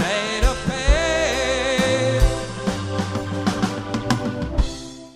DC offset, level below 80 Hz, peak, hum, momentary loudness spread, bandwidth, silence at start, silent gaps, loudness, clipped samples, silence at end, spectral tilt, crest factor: under 0.1%; -26 dBFS; -2 dBFS; none; 7 LU; 13.5 kHz; 0 s; none; -22 LUFS; under 0.1%; 0.05 s; -4.5 dB/octave; 18 dB